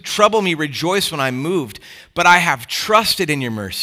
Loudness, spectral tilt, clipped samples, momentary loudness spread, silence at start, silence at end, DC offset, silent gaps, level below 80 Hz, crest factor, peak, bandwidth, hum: -16 LUFS; -3.5 dB/octave; under 0.1%; 11 LU; 0.05 s; 0 s; under 0.1%; none; -54 dBFS; 18 dB; 0 dBFS; 19.5 kHz; none